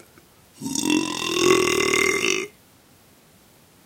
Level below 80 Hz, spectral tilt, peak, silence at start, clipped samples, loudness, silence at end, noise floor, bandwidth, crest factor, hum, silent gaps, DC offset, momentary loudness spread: -56 dBFS; -2.5 dB/octave; -2 dBFS; 0.6 s; under 0.1%; -20 LUFS; 1.35 s; -54 dBFS; 17 kHz; 22 dB; none; none; under 0.1%; 10 LU